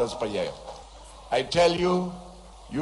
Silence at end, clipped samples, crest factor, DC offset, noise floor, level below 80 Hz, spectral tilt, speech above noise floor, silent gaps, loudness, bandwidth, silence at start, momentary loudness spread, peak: 0 s; under 0.1%; 18 dB; under 0.1%; -46 dBFS; -50 dBFS; -5 dB/octave; 20 dB; none; -26 LUFS; 11.5 kHz; 0 s; 24 LU; -8 dBFS